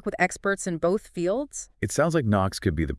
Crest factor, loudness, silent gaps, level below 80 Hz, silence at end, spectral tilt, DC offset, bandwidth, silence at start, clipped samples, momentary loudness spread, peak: 18 dB; -26 LUFS; none; -44 dBFS; 0 s; -5.5 dB/octave; under 0.1%; 12 kHz; 0.05 s; under 0.1%; 6 LU; -8 dBFS